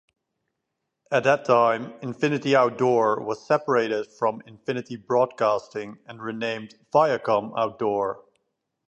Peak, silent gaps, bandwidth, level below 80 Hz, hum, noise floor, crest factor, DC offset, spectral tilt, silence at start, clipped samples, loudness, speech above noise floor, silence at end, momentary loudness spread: -6 dBFS; none; 8.6 kHz; -72 dBFS; none; -81 dBFS; 20 dB; under 0.1%; -6 dB/octave; 1.1 s; under 0.1%; -24 LUFS; 57 dB; 0.7 s; 15 LU